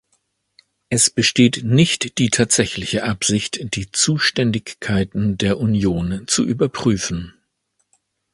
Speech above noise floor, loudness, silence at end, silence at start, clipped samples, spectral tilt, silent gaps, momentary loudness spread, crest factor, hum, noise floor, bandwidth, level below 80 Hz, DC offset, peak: 52 dB; -18 LUFS; 1.05 s; 0.9 s; under 0.1%; -4 dB/octave; none; 9 LU; 20 dB; none; -70 dBFS; 11.5 kHz; -44 dBFS; under 0.1%; 0 dBFS